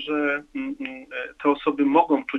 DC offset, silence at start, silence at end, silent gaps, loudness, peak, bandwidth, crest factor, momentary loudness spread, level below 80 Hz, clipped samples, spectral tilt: under 0.1%; 0 s; 0 s; none; -24 LUFS; -4 dBFS; 4.1 kHz; 20 dB; 13 LU; -62 dBFS; under 0.1%; -6.5 dB/octave